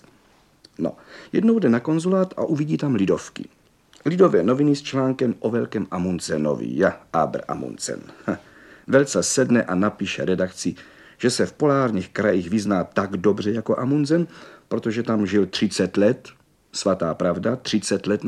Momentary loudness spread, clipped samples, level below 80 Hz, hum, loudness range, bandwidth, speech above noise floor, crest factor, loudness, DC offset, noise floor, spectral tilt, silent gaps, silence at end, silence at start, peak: 11 LU; under 0.1%; -60 dBFS; none; 2 LU; 12.5 kHz; 36 dB; 20 dB; -22 LUFS; under 0.1%; -57 dBFS; -5.5 dB/octave; none; 0 s; 0.8 s; -2 dBFS